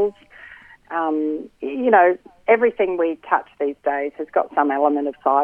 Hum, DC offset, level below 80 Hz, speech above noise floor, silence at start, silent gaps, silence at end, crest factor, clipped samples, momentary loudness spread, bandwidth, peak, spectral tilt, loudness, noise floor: none; under 0.1%; -62 dBFS; 25 dB; 0 s; none; 0 s; 20 dB; under 0.1%; 10 LU; 3.6 kHz; -2 dBFS; -7.5 dB/octave; -20 LUFS; -44 dBFS